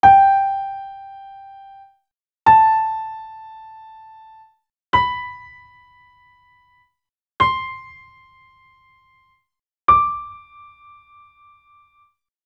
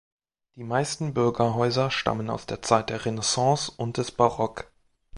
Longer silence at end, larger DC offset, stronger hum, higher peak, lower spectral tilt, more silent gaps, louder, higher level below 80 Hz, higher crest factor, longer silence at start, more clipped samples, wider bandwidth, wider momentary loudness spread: first, 2.1 s vs 0 s; neither; neither; first, 0 dBFS vs -4 dBFS; about the same, -5.5 dB/octave vs -4.5 dB/octave; first, 2.34-2.38 s vs none; first, -17 LUFS vs -25 LUFS; about the same, -50 dBFS vs -54 dBFS; about the same, 22 dB vs 22 dB; second, 0.05 s vs 0.55 s; neither; second, 6.8 kHz vs 11.5 kHz; first, 28 LU vs 8 LU